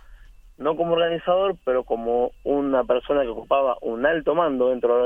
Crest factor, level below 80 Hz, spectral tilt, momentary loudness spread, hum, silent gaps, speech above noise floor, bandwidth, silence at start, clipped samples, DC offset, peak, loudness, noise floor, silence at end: 16 dB; -48 dBFS; -7.5 dB/octave; 4 LU; none; none; 25 dB; 3.7 kHz; 0.1 s; under 0.1%; under 0.1%; -8 dBFS; -22 LUFS; -46 dBFS; 0 s